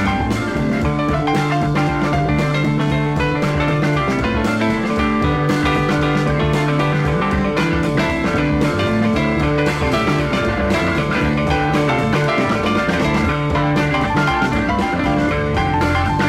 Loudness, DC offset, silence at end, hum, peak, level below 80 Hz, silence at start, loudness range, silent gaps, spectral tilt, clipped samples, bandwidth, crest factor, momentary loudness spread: -17 LUFS; under 0.1%; 0 s; none; -4 dBFS; -30 dBFS; 0 s; 1 LU; none; -6.5 dB/octave; under 0.1%; 13.5 kHz; 14 dB; 1 LU